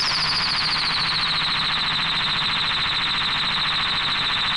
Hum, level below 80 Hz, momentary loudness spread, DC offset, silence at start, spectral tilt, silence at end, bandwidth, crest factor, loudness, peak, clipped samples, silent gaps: none; -46 dBFS; 1 LU; 0.2%; 0 s; -2 dB/octave; 0 s; 11.5 kHz; 10 dB; -20 LUFS; -12 dBFS; under 0.1%; none